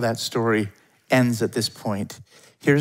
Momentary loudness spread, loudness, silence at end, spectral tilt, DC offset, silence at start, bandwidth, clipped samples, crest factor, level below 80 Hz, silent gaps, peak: 12 LU; -23 LUFS; 0 s; -5.5 dB/octave; under 0.1%; 0 s; 16 kHz; under 0.1%; 20 dB; -66 dBFS; none; -2 dBFS